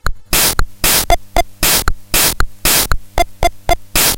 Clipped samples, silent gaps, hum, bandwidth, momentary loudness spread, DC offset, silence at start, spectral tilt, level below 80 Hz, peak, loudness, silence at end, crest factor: under 0.1%; none; none; 17.5 kHz; 6 LU; under 0.1%; 0.05 s; -1.5 dB/octave; -20 dBFS; 0 dBFS; -13 LUFS; 0 s; 14 dB